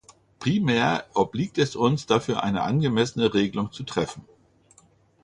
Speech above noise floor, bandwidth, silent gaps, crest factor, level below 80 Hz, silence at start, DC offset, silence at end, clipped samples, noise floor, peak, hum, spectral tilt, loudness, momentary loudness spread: 35 dB; 11 kHz; none; 20 dB; -56 dBFS; 0.4 s; under 0.1%; 1 s; under 0.1%; -59 dBFS; -6 dBFS; none; -6 dB/octave; -24 LUFS; 7 LU